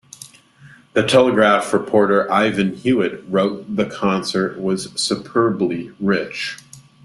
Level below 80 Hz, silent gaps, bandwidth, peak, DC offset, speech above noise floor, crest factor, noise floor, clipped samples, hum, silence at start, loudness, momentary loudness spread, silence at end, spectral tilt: -58 dBFS; none; 12.5 kHz; 0 dBFS; under 0.1%; 29 dB; 18 dB; -47 dBFS; under 0.1%; none; 0.2 s; -18 LUFS; 9 LU; 0.25 s; -5 dB/octave